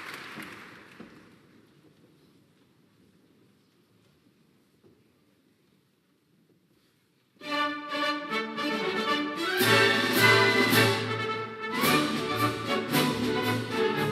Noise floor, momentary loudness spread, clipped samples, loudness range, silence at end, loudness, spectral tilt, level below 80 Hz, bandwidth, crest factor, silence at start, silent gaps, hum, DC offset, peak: -68 dBFS; 19 LU; under 0.1%; 13 LU; 0 s; -25 LUFS; -4 dB/octave; -66 dBFS; 15.5 kHz; 22 dB; 0 s; none; none; under 0.1%; -8 dBFS